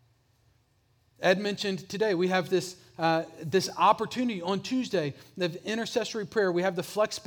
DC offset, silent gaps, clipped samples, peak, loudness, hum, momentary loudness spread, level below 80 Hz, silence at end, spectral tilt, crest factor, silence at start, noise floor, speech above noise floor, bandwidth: under 0.1%; none; under 0.1%; -8 dBFS; -28 LUFS; none; 8 LU; -72 dBFS; 0.05 s; -4.5 dB/octave; 20 dB; 1.2 s; -68 dBFS; 40 dB; over 20 kHz